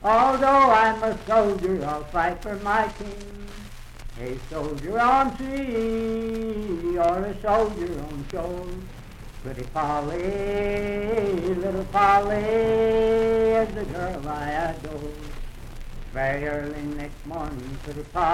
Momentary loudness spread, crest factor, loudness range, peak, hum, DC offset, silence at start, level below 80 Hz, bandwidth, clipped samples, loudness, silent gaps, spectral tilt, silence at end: 20 LU; 18 dB; 8 LU; -6 dBFS; none; under 0.1%; 0 s; -38 dBFS; 15.5 kHz; under 0.1%; -24 LUFS; none; -6 dB/octave; 0 s